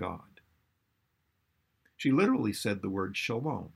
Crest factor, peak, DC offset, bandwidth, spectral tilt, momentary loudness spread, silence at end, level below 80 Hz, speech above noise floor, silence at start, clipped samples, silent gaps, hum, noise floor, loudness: 18 dB; -14 dBFS; under 0.1%; 15 kHz; -5.5 dB/octave; 9 LU; 0.05 s; -68 dBFS; 47 dB; 0 s; under 0.1%; none; none; -77 dBFS; -31 LUFS